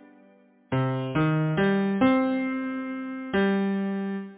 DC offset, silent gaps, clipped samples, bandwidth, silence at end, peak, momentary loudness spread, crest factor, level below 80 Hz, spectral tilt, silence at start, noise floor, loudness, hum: under 0.1%; none; under 0.1%; 4 kHz; 0 s; -10 dBFS; 9 LU; 16 dB; -58 dBFS; -11 dB/octave; 0.7 s; -57 dBFS; -26 LUFS; none